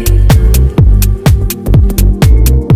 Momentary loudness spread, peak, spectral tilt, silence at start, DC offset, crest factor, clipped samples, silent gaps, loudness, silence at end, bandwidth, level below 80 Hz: 3 LU; 0 dBFS; -6.5 dB/octave; 0 s; under 0.1%; 6 dB; 7%; none; -9 LUFS; 0 s; 16 kHz; -8 dBFS